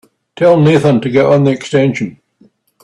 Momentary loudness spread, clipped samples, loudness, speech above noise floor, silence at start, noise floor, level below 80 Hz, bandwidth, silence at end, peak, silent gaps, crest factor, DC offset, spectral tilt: 7 LU; under 0.1%; -11 LUFS; 40 dB; 0.4 s; -50 dBFS; -52 dBFS; 10.5 kHz; 0.7 s; 0 dBFS; none; 12 dB; under 0.1%; -7.5 dB/octave